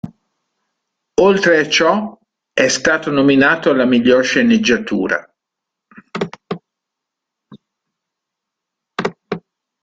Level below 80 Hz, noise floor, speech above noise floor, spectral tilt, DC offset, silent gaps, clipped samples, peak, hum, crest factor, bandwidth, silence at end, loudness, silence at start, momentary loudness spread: -54 dBFS; -81 dBFS; 68 dB; -4 dB/octave; under 0.1%; none; under 0.1%; 0 dBFS; none; 16 dB; 9.2 kHz; 0.45 s; -14 LUFS; 0.05 s; 17 LU